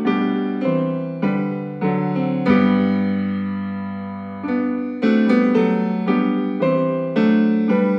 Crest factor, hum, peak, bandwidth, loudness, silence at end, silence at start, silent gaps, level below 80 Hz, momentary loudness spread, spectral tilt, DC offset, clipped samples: 16 dB; none; -2 dBFS; 6 kHz; -19 LUFS; 0 s; 0 s; none; -62 dBFS; 9 LU; -9.5 dB/octave; under 0.1%; under 0.1%